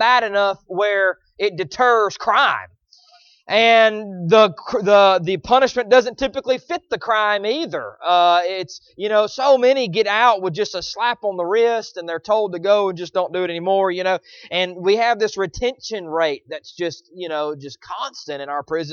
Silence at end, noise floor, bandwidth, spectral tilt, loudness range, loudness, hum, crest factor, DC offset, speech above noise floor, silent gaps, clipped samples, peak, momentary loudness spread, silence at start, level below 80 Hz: 0 s; -53 dBFS; 7.2 kHz; -4 dB/octave; 6 LU; -18 LUFS; none; 18 dB; under 0.1%; 34 dB; none; under 0.1%; -2 dBFS; 13 LU; 0 s; -54 dBFS